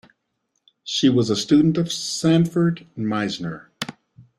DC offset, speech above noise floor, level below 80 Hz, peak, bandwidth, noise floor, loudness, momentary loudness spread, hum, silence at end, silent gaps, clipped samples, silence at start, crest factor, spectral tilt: under 0.1%; 54 dB; -58 dBFS; -6 dBFS; 13.5 kHz; -74 dBFS; -20 LUFS; 15 LU; none; 0.2 s; none; under 0.1%; 0.85 s; 16 dB; -5.5 dB/octave